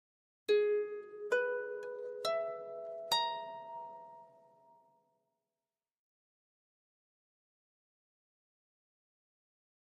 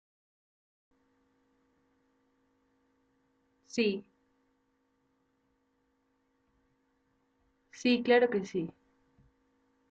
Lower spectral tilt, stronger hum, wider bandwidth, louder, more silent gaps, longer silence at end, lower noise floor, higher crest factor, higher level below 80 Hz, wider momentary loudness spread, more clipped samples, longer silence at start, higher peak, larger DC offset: second, -1.5 dB/octave vs -3.5 dB/octave; neither; first, 9.4 kHz vs 8 kHz; second, -37 LUFS vs -30 LUFS; neither; first, 5.55 s vs 1.2 s; first, under -90 dBFS vs -76 dBFS; about the same, 22 dB vs 24 dB; second, under -90 dBFS vs -78 dBFS; about the same, 15 LU vs 14 LU; neither; second, 0.5 s vs 3.75 s; second, -18 dBFS vs -14 dBFS; neither